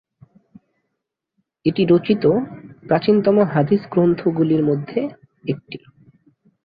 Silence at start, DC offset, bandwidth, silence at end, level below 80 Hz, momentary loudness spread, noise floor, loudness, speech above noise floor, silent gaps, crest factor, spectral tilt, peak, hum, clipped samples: 1.65 s; under 0.1%; 5 kHz; 0.9 s; -58 dBFS; 15 LU; -79 dBFS; -18 LUFS; 62 dB; none; 16 dB; -11.5 dB/octave; -4 dBFS; none; under 0.1%